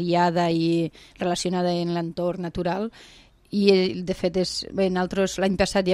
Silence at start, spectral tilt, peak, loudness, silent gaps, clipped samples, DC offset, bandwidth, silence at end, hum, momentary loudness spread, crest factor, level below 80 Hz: 0 s; -5.5 dB/octave; -2 dBFS; -24 LUFS; none; under 0.1%; under 0.1%; 13 kHz; 0 s; none; 8 LU; 22 dB; -48 dBFS